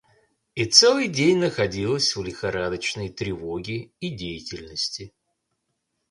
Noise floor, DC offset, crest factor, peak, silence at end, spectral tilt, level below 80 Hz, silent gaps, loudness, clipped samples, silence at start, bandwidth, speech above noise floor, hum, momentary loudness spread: -77 dBFS; under 0.1%; 24 dB; -2 dBFS; 1 s; -3 dB/octave; -52 dBFS; none; -22 LUFS; under 0.1%; 0.55 s; 11.5 kHz; 53 dB; none; 18 LU